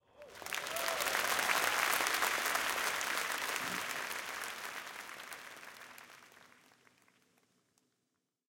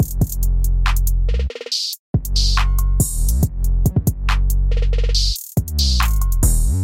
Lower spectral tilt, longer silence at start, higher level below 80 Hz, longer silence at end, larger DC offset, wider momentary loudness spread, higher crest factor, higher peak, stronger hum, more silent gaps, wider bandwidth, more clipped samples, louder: second, 0.5 dB/octave vs -4 dB/octave; first, 0.15 s vs 0 s; second, -76 dBFS vs -18 dBFS; first, 2.1 s vs 0 s; second, under 0.1% vs 0.2%; first, 19 LU vs 4 LU; first, 26 dB vs 12 dB; second, -12 dBFS vs -4 dBFS; neither; second, none vs 1.99-2.14 s; about the same, 17 kHz vs 17 kHz; neither; second, -34 LUFS vs -19 LUFS